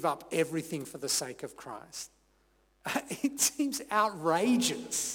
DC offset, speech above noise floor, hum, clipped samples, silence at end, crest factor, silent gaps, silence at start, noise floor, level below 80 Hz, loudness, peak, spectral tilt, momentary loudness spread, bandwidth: under 0.1%; 37 dB; none; under 0.1%; 0 s; 20 dB; none; 0 s; -69 dBFS; -70 dBFS; -31 LUFS; -12 dBFS; -2.5 dB/octave; 15 LU; 19 kHz